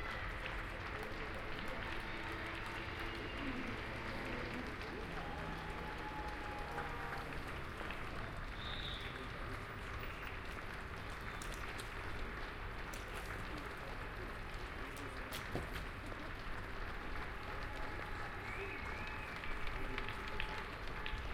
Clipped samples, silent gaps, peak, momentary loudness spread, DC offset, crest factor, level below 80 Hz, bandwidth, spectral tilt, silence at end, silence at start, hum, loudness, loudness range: under 0.1%; none; -22 dBFS; 3 LU; under 0.1%; 22 dB; -50 dBFS; 16 kHz; -5 dB/octave; 0 s; 0 s; none; -45 LUFS; 2 LU